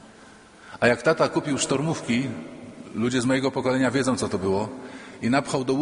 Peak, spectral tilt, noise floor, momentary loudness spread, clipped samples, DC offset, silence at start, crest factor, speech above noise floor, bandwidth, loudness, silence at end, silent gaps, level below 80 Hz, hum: -4 dBFS; -5 dB/octave; -49 dBFS; 16 LU; under 0.1%; under 0.1%; 0.05 s; 20 dB; 25 dB; 10.5 kHz; -24 LUFS; 0 s; none; -58 dBFS; none